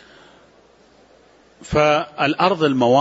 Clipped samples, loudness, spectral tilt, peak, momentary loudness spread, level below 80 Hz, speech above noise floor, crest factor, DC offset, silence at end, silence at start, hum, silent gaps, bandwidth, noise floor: under 0.1%; -18 LUFS; -5.5 dB/octave; -2 dBFS; 5 LU; -46 dBFS; 35 dB; 18 dB; under 0.1%; 0 s; 1.6 s; none; none; 8 kHz; -52 dBFS